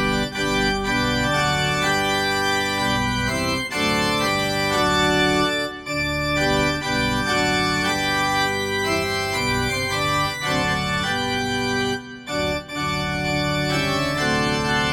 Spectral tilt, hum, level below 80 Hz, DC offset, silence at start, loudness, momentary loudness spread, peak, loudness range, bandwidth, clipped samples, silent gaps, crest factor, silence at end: -4 dB/octave; none; -40 dBFS; under 0.1%; 0 s; -21 LUFS; 4 LU; -6 dBFS; 3 LU; 17 kHz; under 0.1%; none; 14 dB; 0 s